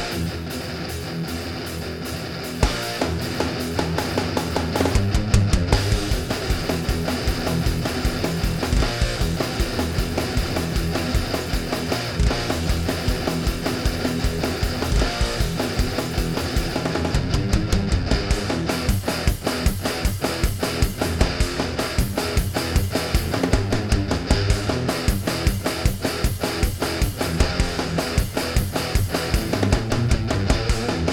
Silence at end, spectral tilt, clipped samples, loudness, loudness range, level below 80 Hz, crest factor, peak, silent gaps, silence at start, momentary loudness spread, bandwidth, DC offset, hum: 0 s; -5 dB/octave; under 0.1%; -23 LUFS; 2 LU; -26 dBFS; 20 dB; -2 dBFS; none; 0 s; 3 LU; 18.5 kHz; under 0.1%; none